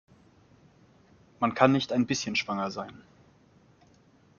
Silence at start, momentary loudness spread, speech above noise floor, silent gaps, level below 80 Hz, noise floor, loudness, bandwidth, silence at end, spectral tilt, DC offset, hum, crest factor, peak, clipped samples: 1.4 s; 13 LU; 34 dB; none; -68 dBFS; -61 dBFS; -27 LUFS; 7.2 kHz; 1.4 s; -5 dB/octave; under 0.1%; none; 26 dB; -6 dBFS; under 0.1%